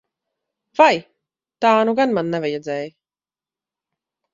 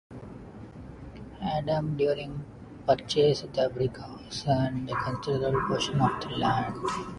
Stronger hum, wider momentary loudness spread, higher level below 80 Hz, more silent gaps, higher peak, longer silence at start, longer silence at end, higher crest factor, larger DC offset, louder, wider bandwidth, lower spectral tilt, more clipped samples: neither; second, 13 LU vs 19 LU; second, -66 dBFS vs -52 dBFS; neither; first, 0 dBFS vs -10 dBFS; first, 0.8 s vs 0.1 s; first, 1.45 s vs 0 s; about the same, 22 dB vs 18 dB; neither; first, -18 LUFS vs -28 LUFS; second, 7.6 kHz vs 11.5 kHz; about the same, -5.5 dB/octave vs -6 dB/octave; neither